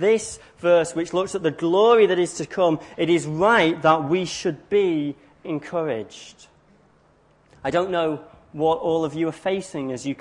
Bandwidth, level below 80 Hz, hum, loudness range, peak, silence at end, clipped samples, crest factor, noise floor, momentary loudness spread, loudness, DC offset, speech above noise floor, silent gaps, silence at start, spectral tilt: 11 kHz; -60 dBFS; none; 9 LU; -4 dBFS; 0.05 s; under 0.1%; 18 dB; -58 dBFS; 14 LU; -22 LUFS; under 0.1%; 37 dB; none; 0 s; -5 dB/octave